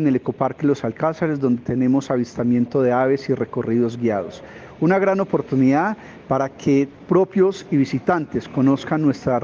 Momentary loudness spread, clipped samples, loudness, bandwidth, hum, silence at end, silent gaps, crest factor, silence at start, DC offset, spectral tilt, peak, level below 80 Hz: 6 LU; under 0.1%; -20 LUFS; 7.2 kHz; none; 0 s; none; 16 dB; 0 s; under 0.1%; -8 dB/octave; -4 dBFS; -56 dBFS